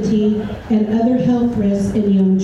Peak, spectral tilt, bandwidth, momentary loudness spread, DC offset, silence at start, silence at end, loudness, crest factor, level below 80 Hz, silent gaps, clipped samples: -6 dBFS; -8.5 dB/octave; 11.5 kHz; 4 LU; under 0.1%; 0 s; 0 s; -16 LUFS; 8 dB; -40 dBFS; none; under 0.1%